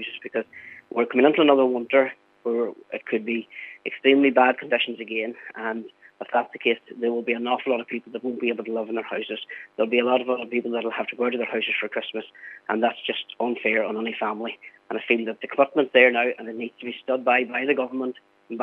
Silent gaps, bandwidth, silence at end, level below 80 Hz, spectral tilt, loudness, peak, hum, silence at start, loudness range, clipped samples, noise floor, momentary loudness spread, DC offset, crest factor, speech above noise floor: none; 4.2 kHz; 0 s; -86 dBFS; -7 dB/octave; -24 LUFS; -2 dBFS; none; 0 s; 4 LU; under 0.1%; -43 dBFS; 15 LU; under 0.1%; 22 dB; 19 dB